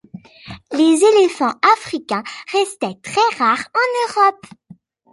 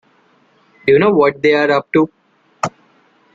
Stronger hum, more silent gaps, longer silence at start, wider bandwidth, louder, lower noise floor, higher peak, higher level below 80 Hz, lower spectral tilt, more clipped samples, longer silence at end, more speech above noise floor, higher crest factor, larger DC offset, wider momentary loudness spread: neither; neither; second, 0.15 s vs 0.85 s; first, 11.5 kHz vs 7.6 kHz; about the same, -16 LUFS vs -15 LUFS; second, -46 dBFS vs -54 dBFS; about the same, 0 dBFS vs 0 dBFS; about the same, -60 dBFS vs -58 dBFS; second, -3.5 dB/octave vs -6 dB/octave; neither; first, 0.8 s vs 0.65 s; second, 30 dB vs 42 dB; about the same, 18 dB vs 16 dB; neither; about the same, 11 LU vs 13 LU